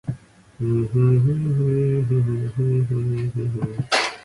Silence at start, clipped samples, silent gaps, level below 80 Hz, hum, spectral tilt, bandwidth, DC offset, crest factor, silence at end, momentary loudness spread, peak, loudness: 0.05 s; under 0.1%; none; -48 dBFS; none; -6.5 dB/octave; 11 kHz; under 0.1%; 14 dB; 0.05 s; 8 LU; -6 dBFS; -21 LUFS